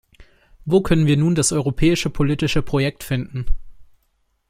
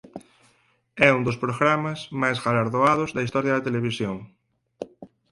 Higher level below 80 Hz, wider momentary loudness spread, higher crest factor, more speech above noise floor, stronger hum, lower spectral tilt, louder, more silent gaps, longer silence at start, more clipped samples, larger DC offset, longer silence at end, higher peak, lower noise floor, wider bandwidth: first, -32 dBFS vs -58 dBFS; second, 13 LU vs 21 LU; second, 16 dB vs 22 dB; first, 48 dB vs 41 dB; neither; about the same, -5.5 dB/octave vs -6 dB/octave; first, -19 LUFS vs -23 LUFS; neither; about the same, 0.2 s vs 0.15 s; neither; neither; first, 0.65 s vs 0.25 s; about the same, -4 dBFS vs -2 dBFS; about the same, -66 dBFS vs -64 dBFS; first, 16 kHz vs 11.5 kHz